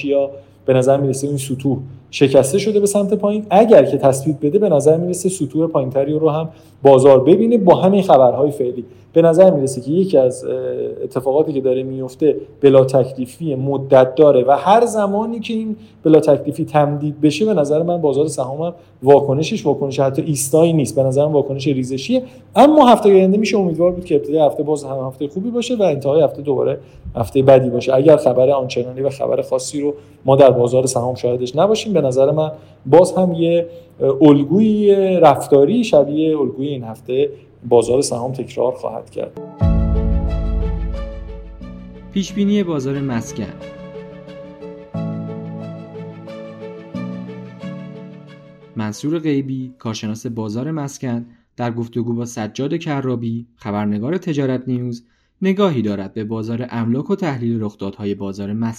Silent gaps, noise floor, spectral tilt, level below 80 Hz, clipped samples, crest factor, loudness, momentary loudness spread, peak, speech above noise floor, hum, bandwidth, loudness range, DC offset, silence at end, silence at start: none; -41 dBFS; -6.5 dB/octave; -34 dBFS; under 0.1%; 16 dB; -16 LUFS; 17 LU; 0 dBFS; 26 dB; none; 17 kHz; 11 LU; under 0.1%; 0 s; 0 s